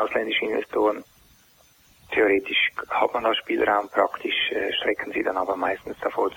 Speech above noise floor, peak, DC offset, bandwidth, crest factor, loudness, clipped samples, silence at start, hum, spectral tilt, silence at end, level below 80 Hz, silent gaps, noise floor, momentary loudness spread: 33 dB; -6 dBFS; under 0.1%; 16.5 kHz; 18 dB; -24 LUFS; under 0.1%; 0 s; none; -4 dB/octave; 0 s; -60 dBFS; none; -57 dBFS; 6 LU